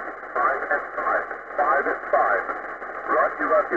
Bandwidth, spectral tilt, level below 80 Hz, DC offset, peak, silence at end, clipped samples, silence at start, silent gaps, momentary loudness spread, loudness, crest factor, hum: 7.2 kHz; -6 dB/octave; -58 dBFS; 0.1%; -8 dBFS; 0 s; under 0.1%; 0 s; none; 9 LU; -23 LUFS; 16 dB; none